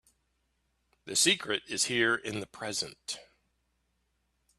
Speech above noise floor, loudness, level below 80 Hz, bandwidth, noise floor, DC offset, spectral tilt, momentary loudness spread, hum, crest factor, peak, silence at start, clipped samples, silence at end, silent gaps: 46 dB; -29 LUFS; -72 dBFS; 14 kHz; -77 dBFS; under 0.1%; -1.5 dB/octave; 15 LU; none; 24 dB; -10 dBFS; 1.05 s; under 0.1%; 1.35 s; none